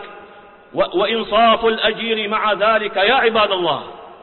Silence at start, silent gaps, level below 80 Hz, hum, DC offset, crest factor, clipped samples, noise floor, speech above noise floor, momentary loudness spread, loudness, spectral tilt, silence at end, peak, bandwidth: 0 s; none; -52 dBFS; none; under 0.1%; 14 dB; under 0.1%; -42 dBFS; 26 dB; 10 LU; -16 LUFS; -8.5 dB/octave; 0.05 s; -4 dBFS; 4.3 kHz